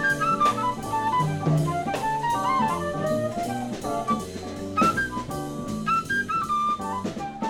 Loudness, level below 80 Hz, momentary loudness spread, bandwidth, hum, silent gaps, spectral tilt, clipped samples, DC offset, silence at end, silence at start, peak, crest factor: -25 LUFS; -50 dBFS; 8 LU; 17 kHz; none; none; -5.5 dB/octave; under 0.1%; under 0.1%; 0 s; 0 s; -10 dBFS; 16 dB